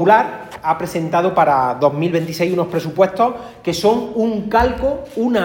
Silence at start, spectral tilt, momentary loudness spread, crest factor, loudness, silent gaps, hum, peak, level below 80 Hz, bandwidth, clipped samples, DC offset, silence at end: 0 s; -6 dB/octave; 7 LU; 16 dB; -17 LUFS; none; none; 0 dBFS; -40 dBFS; 17 kHz; under 0.1%; under 0.1%; 0 s